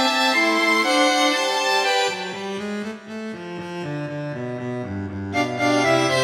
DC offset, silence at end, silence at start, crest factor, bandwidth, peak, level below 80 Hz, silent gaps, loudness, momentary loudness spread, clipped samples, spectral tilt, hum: under 0.1%; 0 s; 0 s; 16 dB; 18 kHz; -6 dBFS; -64 dBFS; none; -21 LUFS; 14 LU; under 0.1%; -3.5 dB/octave; none